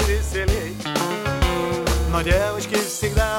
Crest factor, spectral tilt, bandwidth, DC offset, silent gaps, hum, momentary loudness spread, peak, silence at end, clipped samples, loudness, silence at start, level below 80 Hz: 14 dB; -4.5 dB/octave; 17 kHz; under 0.1%; none; none; 4 LU; -6 dBFS; 0 s; under 0.1%; -22 LUFS; 0 s; -26 dBFS